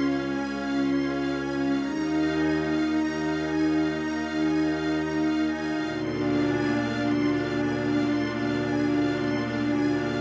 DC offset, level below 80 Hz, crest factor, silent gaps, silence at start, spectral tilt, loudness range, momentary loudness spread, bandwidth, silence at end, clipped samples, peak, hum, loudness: under 0.1%; -50 dBFS; 12 dB; none; 0 s; -6.5 dB/octave; 1 LU; 3 LU; 8 kHz; 0 s; under 0.1%; -14 dBFS; none; -26 LUFS